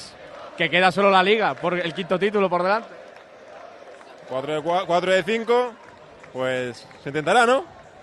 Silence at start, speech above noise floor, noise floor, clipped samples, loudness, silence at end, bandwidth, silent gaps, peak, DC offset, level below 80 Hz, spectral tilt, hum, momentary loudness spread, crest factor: 0 s; 24 dB; -45 dBFS; under 0.1%; -21 LUFS; 0.2 s; 12 kHz; none; -4 dBFS; under 0.1%; -66 dBFS; -4.5 dB/octave; none; 22 LU; 20 dB